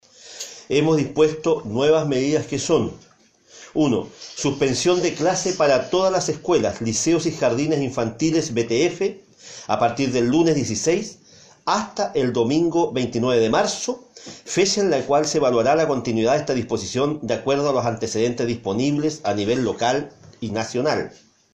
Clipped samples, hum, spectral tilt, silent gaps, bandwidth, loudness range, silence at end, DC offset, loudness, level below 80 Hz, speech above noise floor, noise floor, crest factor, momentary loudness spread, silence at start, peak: under 0.1%; none; -4.5 dB/octave; none; 10.5 kHz; 2 LU; 0.45 s; under 0.1%; -21 LUFS; -54 dBFS; 31 dB; -51 dBFS; 16 dB; 9 LU; 0.25 s; -4 dBFS